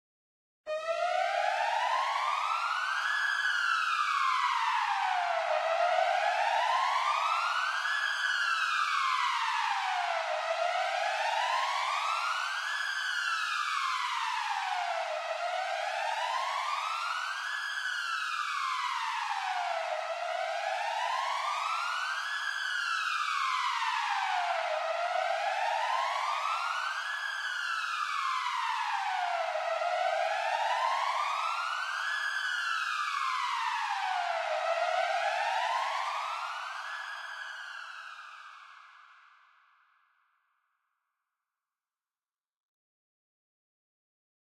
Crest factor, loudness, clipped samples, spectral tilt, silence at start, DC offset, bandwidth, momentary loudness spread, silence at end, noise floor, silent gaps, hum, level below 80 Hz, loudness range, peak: 16 dB; -31 LUFS; under 0.1%; 5 dB/octave; 0.65 s; under 0.1%; 15.5 kHz; 5 LU; 5.5 s; under -90 dBFS; none; none; under -90 dBFS; 4 LU; -16 dBFS